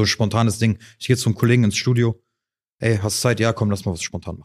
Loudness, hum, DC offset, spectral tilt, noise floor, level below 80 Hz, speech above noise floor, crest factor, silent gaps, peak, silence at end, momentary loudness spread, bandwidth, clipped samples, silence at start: -20 LUFS; none; under 0.1%; -5 dB/octave; -84 dBFS; -50 dBFS; 64 dB; 18 dB; 2.74-2.78 s; -2 dBFS; 0 s; 9 LU; 15 kHz; under 0.1%; 0 s